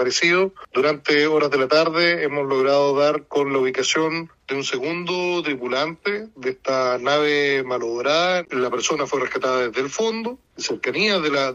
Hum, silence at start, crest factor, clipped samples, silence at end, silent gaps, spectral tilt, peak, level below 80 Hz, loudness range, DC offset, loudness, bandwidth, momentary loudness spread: none; 0 s; 16 dB; under 0.1%; 0 s; none; -3.5 dB/octave; -4 dBFS; -64 dBFS; 4 LU; under 0.1%; -21 LUFS; 8 kHz; 8 LU